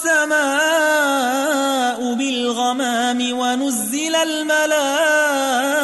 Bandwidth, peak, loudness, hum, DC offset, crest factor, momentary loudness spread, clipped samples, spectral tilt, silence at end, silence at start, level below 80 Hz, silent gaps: 12.5 kHz; -6 dBFS; -17 LUFS; none; under 0.1%; 12 dB; 4 LU; under 0.1%; -1 dB/octave; 0 s; 0 s; -68 dBFS; none